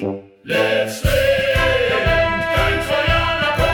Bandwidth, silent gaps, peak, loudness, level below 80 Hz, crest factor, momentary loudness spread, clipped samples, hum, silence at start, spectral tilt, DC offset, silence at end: 18 kHz; none; -6 dBFS; -17 LUFS; -28 dBFS; 12 dB; 3 LU; under 0.1%; none; 0 s; -4.5 dB/octave; under 0.1%; 0 s